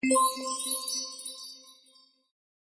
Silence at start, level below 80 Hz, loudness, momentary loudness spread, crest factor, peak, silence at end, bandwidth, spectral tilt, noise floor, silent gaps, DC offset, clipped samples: 0 s; -84 dBFS; -29 LUFS; 19 LU; 18 dB; -14 dBFS; 0.95 s; 11 kHz; -0.5 dB/octave; -62 dBFS; none; under 0.1%; under 0.1%